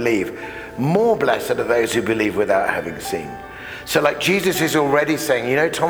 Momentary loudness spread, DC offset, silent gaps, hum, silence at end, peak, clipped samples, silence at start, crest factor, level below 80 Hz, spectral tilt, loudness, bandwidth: 13 LU; under 0.1%; none; none; 0 s; 0 dBFS; under 0.1%; 0 s; 18 dB; -50 dBFS; -4.5 dB/octave; -19 LUFS; over 20 kHz